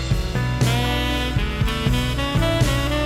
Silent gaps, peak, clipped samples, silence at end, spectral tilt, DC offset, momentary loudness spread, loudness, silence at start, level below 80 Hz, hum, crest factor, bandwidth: none; -6 dBFS; under 0.1%; 0 s; -5.5 dB/octave; under 0.1%; 4 LU; -21 LUFS; 0 s; -26 dBFS; none; 14 dB; 16 kHz